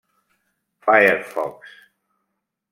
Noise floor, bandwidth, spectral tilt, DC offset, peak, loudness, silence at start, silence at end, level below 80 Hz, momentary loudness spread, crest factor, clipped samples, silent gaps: -78 dBFS; 16.5 kHz; -5 dB/octave; under 0.1%; -2 dBFS; -18 LUFS; 0.85 s; 1.05 s; -70 dBFS; 14 LU; 22 dB; under 0.1%; none